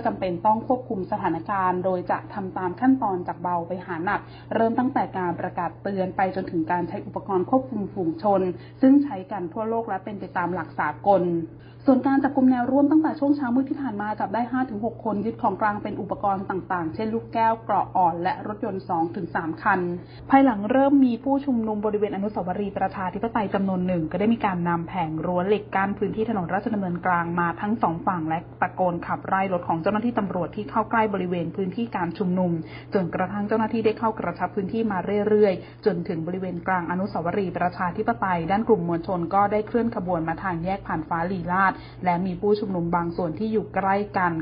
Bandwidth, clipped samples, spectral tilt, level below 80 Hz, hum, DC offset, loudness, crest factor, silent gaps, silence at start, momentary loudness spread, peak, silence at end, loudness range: 5.2 kHz; under 0.1%; -12 dB/octave; -52 dBFS; none; under 0.1%; -24 LUFS; 20 dB; none; 0 s; 8 LU; -4 dBFS; 0 s; 4 LU